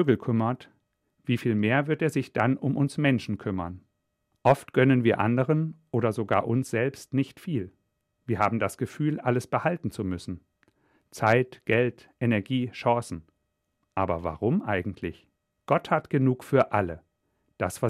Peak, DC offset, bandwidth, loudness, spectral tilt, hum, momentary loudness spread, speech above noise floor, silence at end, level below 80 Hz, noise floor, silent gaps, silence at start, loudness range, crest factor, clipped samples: -8 dBFS; under 0.1%; 14.5 kHz; -27 LUFS; -7 dB/octave; none; 12 LU; 52 dB; 0 s; -62 dBFS; -77 dBFS; none; 0 s; 4 LU; 20 dB; under 0.1%